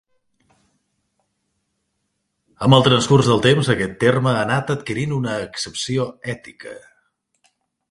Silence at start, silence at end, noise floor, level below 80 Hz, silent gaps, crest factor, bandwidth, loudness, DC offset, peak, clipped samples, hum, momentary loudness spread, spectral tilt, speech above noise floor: 2.6 s; 1.1 s; -73 dBFS; -52 dBFS; none; 20 dB; 11.5 kHz; -18 LUFS; under 0.1%; 0 dBFS; under 0.1%; none; 16 LU; -5.5 dB/octave; 55 dB